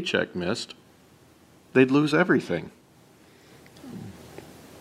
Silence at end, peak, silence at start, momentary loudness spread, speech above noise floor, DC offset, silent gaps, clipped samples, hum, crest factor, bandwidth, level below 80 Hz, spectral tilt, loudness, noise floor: 0 s; -6 dBFS; 0 s; 25 LU; 32 dB; under 0.1%; none; under 0.1%; none; 22 dB; 15 kHz; -64 dBFS; -6 dB/octave; -24 LUFS; -55 dBFS